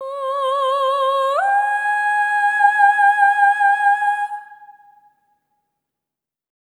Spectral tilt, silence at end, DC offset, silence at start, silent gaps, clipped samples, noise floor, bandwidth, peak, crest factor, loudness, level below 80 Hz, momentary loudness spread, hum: 3 dB/octave; 2 s; under 0.1%; 0 s; none; under 0.1%; -86 dBFS; 10.5 kHz; -2 dBFS; 16 dB; -16 LUFS; under -90 dBFS; 8 LU; none